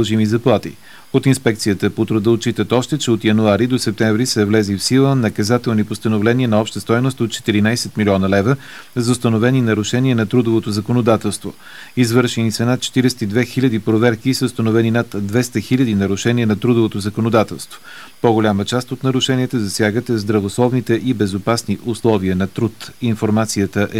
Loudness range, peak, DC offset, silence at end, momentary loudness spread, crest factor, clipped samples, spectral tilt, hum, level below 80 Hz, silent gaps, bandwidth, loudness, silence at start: 2 LU; 0 dBFS; 0.8%; 0 s; 5 LU; 16 dB; under 0.1%; -6 dB/octave; none; -54 dBFS; none; over 20 kHz; -17 LUFS; 0 s